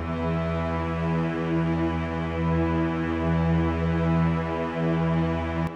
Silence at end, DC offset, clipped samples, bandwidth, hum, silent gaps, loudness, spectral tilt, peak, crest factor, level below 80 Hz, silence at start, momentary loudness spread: 0 s; under 0.1%; under 0.1%; 6.6 kHz; none; none; -26 LUFS; -9 dB/octave; -14 dBFS; 12 dB; -38 dBFS; 0 s; 4 LU